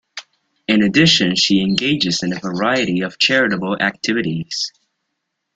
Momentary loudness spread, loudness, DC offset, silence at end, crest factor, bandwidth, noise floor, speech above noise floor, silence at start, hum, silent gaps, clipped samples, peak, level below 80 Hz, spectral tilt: 11 LU; -16 LUFS; under 0.1%; 0.85 s; 18 dB; 9.2 kHz; -75 dBFS; 58 dB; 0.15 s; none; none; under 0.1%; 0 dBFS; -54 dBFS; -4 dB/octave